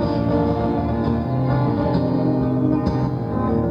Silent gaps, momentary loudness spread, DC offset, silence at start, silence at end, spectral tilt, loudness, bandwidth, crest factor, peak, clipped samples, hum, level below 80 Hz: none; 2 LU; under 0.1%; 0 s; 0 s; -10 dB/octave; -20 LUFS; 5.6 kHz; 14 dB; -6 dBFS; under 0.1%; none; -34 dBFS